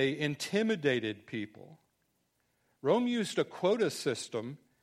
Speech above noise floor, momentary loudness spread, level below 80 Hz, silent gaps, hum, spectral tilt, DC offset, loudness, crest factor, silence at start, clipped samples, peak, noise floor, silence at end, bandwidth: 45 dB; 11 LU; -78 dBFS; none; none; -5 dB/octave; under 0.1%; -32 LUFS; 20 dB; 0 s; under 0.1%; -14 dBFS; -77 dBFS; 0.25 s; 14.5 kHz